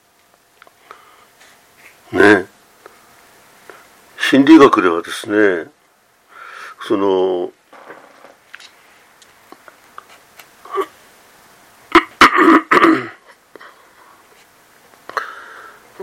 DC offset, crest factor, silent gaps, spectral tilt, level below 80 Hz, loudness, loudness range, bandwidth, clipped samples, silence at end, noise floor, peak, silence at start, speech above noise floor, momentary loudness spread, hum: under 0.1%; 18 dB; none; -4.5 dB/octave; -54 dBFS; -13 LUFS; 18 LU; 15.5 kHz; under 0.1%; 0 s; -55 dBFS; 0 dBFS; 2.1 s; 43 dB; 25 LU; none